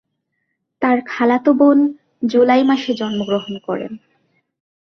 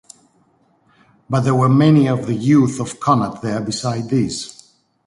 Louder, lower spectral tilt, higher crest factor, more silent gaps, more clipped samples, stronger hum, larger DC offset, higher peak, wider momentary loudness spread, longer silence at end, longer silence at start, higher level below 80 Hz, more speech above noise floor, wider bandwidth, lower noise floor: about the same, -16 LUFS vs -17 LUFS; about the same, -6.5 dB/octave vs -6.5 dB/octave; about the same, 16 dB vs 16 dB; neither; neither; neither; neither; about the same, -2 dBFS vs -2 dBFS; about the same, 12 LU vs 10 LU; first, 0.9 s vs 0.55 s; second, 0.8 s vs 1.3 s; second, -62 dBFS vs -54 dBFS; first, 57 dB vs 42 dB; second, 6.4 kHz vs 11.5 kHz; first, -72 dBFS vs -58 dBFS